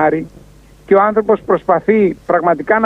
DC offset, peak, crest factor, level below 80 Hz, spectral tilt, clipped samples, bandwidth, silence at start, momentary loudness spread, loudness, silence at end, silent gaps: under 0.1%; 0 dBFS; 14 dB; -46 dBFS; -8.5 dB/octave; under 0.1%; 5.6 kHz; 0 s; 4 LU; -14 LUFS; 0 s; none